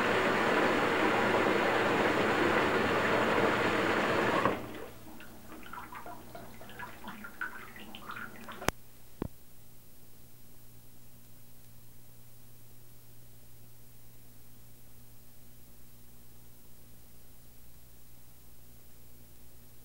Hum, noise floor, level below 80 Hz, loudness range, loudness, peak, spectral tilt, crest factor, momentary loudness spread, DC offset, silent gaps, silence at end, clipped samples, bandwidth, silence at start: 60 Hz at -60 dBFS; -55 dBFS; -60 dBFS; 17 LU; -29 LUFS; -6 dBFS; -4.5 dB/octave; 30 dB; 20 LU; 0.4%; none; 0.1 s; under 0.1%; 16 kHz; 0 s